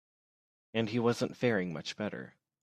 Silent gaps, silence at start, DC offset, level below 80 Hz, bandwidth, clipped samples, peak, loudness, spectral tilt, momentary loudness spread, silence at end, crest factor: none; 0.75 s; under 0.1%; -74 dBFS; 13.5 kHz; under 0.1%; -14 dBFS; -33 LUFS; -6 dB/octave; 10 LU; 0.35 s; 20 dB